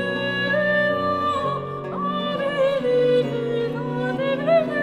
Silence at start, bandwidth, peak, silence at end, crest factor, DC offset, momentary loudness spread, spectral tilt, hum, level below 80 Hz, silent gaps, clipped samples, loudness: 0 s; 10.5 kHz; -8 dBFS; 0 s; 14 dB; under 0.1%; 7 LU; -6.5 dB/octave; none; -56 dBFS; none; under 0.1%; -22 LUFS